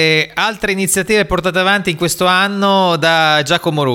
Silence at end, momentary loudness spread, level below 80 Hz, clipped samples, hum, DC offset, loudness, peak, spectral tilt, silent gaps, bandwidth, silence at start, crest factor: 0 s; 4 LU; -40 dBFS; under 0.1%; none; under 0.1%; -13 LUFS; 0 dBFS; -3.5 dB/octave; none; 18 kHz; 0 s; 12 dB